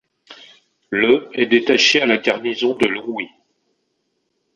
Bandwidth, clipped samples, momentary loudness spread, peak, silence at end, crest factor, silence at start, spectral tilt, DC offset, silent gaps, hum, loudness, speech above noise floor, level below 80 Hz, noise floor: 9.4 kHz; under 0.1%; 13 LU; -2 dBFS; 1.3 s; 18 dB; 0.3 s; -3 dB/octave; under 0.1%; none; none; -17 LUFS; 53 dB; -62 dBFS; -70 dBFS